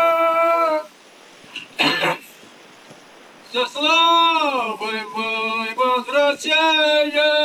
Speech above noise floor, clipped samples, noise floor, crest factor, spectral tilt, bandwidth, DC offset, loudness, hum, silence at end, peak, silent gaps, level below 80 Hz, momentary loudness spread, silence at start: 29 dB; under 0.1%; -46 dBFS; 18 dB; -2.5 dB/octave; 17 kHz; under 0.1%; -18 LUFS; none; 0 s; -2 dBFS; none; -74 dBFS; 11 LU; 0 s